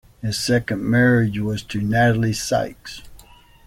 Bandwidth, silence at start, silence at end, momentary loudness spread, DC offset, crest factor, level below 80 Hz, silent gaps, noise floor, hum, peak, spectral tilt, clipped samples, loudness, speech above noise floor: 15.5 kHz; 0.25 s; 0.5 s; 14 LU; under 0.1%; 16 dB; -44 dBFS; none; -47 dBFS; none; -6 dBFS; -5.5 dB/octave; under 0.1%; -20 LUFS; 28 dB